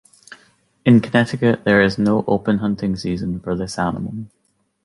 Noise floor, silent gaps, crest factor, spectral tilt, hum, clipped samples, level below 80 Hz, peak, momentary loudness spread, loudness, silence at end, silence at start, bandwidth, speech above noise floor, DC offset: -56 dBFS; none; 18 dB; -7 dB/octave; none; under 0.1%; -46 dBFS; -2 dBFS; 11 LU; -18 LUFS; 0.6 s; 0.3 s; 11.5 kHz; 38 dB; under 0.1%